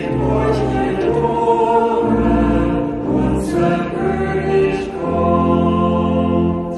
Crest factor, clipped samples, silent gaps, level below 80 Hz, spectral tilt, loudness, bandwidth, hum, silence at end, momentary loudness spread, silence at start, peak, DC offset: 14 dB; under 0.1%; none; -30 dBFS; -8 dB/octave; -16 LUFS; 12 kHz; none; 0 s; 4 LU; 0 s; -2 dBFS; under 0.1%